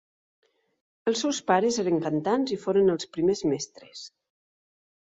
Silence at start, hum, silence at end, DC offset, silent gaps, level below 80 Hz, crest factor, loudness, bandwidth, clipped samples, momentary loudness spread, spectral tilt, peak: 1.05 s; none; 0.95 s; under 0.1%; none; -66 dBFS; 20 dB; -26 LUFS; 8 kHz; under 0.1%; 18 LU; -4.5 dB/octave; -8 dBFS